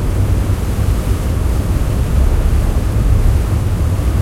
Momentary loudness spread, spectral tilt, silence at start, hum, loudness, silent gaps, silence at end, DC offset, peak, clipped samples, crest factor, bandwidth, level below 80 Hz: 3 LU; -7 dB/octave; 0 s; none; -16 LUFS; none; 0 s; under 0.1%; -2 dBFS; under 0.1%; 12 dB; 16 kHz; -16 dBFS